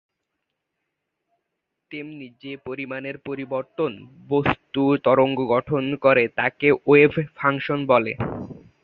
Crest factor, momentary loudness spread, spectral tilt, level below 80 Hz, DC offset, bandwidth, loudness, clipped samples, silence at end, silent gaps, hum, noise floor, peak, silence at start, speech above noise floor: 20 dB; 19 LU; -9.5 dB/octave; -54 dBFS; under 0.1%; 5.2 kHz; -21 LUFS; under 0.1%; 0.25 s; none; none; -80 dBFS; -2 dBFS; 1.9 s; 58 dB